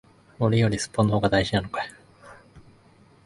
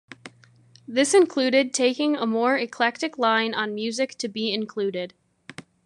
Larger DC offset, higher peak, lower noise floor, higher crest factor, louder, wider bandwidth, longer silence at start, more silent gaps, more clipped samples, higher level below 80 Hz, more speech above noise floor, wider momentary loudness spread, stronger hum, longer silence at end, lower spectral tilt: neither; about the same, -6 dBFS vs -6 dBFS; about the same, -55 dBFS vs -55 dBFS; about the same, 20 dB vs 18 dB; about the same, -24 LUFS vs -23 LUFS; about the same, 11.5 kHz vs 11.5 kHz; first, 0.4 s vs 0.25 s; neither; neither; first, -48 dBFS vs -76 dBFS; about the same, 33 dB vs 32 dB; second, 11 LU vs 19 LU; neither; first, 0.65 s vs 0.25 s; first, -6 dB/octave vs -3 dB/octave